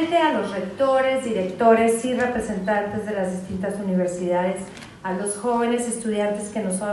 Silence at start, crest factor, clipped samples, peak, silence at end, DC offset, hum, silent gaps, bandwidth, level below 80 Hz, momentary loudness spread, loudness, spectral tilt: 0 s; 18 dB; under 0.1%; -4 dBFS; 0 s; under 0.1%; none; none; 12.5 kHz; -54 dBFS; 9 LU; -23 LUFS; -5 dB/octave